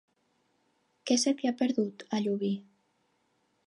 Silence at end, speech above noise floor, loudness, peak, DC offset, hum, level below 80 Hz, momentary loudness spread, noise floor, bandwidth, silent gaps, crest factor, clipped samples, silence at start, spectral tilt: 1.05 s; 45 dB; -30 LUFS; -14 dBFS; under 0.1%; none; -86 dBFS; 8 LU; -74 dBFS; 11.5 kHz; none; 20 dB; under 0.1%; 1.05 s; -4 dB/octave